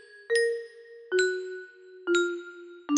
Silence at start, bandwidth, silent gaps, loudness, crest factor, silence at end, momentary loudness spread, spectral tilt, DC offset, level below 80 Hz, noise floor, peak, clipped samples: 0.15 s; 10.5 kHz; none; -28 LUFS; 18 dB; 0 s; 19 LU; -1 dB/octave; under 0.1%; -76 dBFS; -47 dBFS; -10 dBFS; under 0.1%